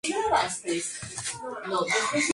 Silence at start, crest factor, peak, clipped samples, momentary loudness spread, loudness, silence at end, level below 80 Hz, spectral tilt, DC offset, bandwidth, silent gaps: 0.05 s; 18 dB; -10 dBFS; under 0.1%; 8 LU; -28 LUFS; 0 s; -60 dBFS; -2 dB/octave; under 0.1%; 11.5 kHz; none